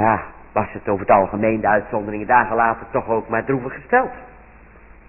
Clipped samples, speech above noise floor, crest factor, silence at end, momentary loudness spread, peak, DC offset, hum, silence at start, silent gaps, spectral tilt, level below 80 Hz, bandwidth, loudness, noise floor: under 0.1%; 26 dB; 18 dB; 0.8 s; 9 LU; -2 dBFS; under 0.1%; none; 0 s; none; -12.5 dB/octave; -46 dBFS; 3 kHz; -19 LUFS; -45 dBFS